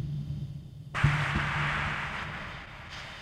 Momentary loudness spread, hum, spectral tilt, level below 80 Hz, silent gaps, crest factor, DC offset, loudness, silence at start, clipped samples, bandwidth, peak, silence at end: 14 LU; none; -5.5 dB/octave; -46 dBFS; none; 22 dB; under 0.1%; -31 LUFS; 0 s; under 0.1%; 10.5 kHz; -10 dBFS; 0 s